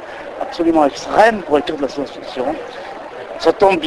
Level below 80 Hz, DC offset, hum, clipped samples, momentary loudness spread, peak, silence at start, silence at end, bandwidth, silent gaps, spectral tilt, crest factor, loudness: -48 dBFS; under 0.1%; none; under 0.1%; 17 LU; 0 dBFS; 0 s; 0 s; 12 kHz; none; -4.5 dB/octave; 16 dB; -17 LUFS